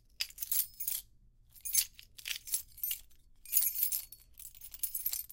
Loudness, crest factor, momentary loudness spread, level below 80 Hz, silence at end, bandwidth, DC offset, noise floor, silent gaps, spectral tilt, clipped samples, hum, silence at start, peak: -33 LUFS; 30 dB; 17 LU; -64 dBFS; 0 s; 17 kHz; under 0.1%; -63 dBFS; none; 3 dB/octave; under 0.1%; none; 0.2 s; -8 dBFS